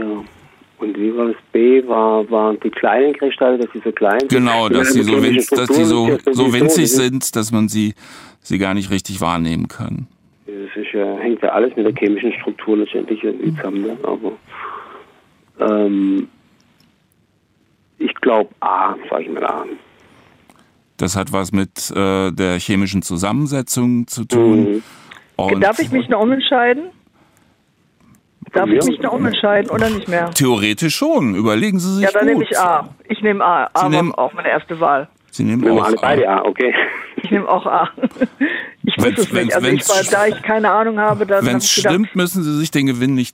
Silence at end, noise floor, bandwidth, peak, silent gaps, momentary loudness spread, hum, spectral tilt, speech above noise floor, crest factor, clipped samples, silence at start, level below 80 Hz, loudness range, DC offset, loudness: 0.05 s; -59 dBFS; 16 kHz; -2 dBFS; none; 9 LU; none; -4.5 dB/octave; 43 dB; 14 dB; under 0.1%; 0 s; -54 dBFS; 7 LU; under 0.1%; -16 LUFS